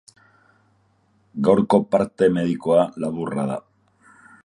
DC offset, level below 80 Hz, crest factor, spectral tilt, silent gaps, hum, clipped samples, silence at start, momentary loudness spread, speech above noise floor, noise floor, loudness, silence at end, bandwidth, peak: under 0.1%; -58 dBFS; 20 dB; -7.5 dB/octave; none; none; under 0.1%; 1.35 s; 10 LU; 43 dB; -62 dBFS; -20 LUFS; 0.85 s; 11 kHz; -2 dBFS